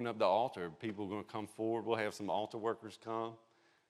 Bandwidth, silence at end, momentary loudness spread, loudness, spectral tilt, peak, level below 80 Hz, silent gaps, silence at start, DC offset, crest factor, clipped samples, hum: 14 kHz; 0.55 s; 10 LU; -39 LUFS; -5.5 dB/octave; -18 dBFS; -86 dBFS; none; 0 s; under 0.1%; 20 dB; under 0.1%; none